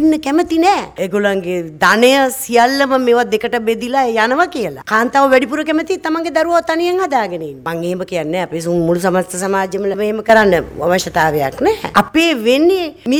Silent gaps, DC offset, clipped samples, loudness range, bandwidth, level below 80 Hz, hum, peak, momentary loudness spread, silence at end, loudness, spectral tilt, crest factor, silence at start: none; under 0.1%; under 0.1%; 4 LU; 19.5 kHz; -46 dBFS; none; 0 dBFS; 8 LU; 0 s; -14 LUFS; -4.5 dB/octave; 14 dB; 0 s